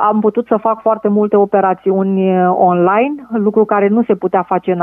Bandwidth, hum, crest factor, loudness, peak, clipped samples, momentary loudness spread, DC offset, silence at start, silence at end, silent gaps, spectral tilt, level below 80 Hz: 3.6 kHz; none; 12 dB; -13 LUFS; 0 dBFS; under 0.1%; 4 LU; under 0.1%; 0 s; 0 s; none; -11 dB/octave; -62 dBFS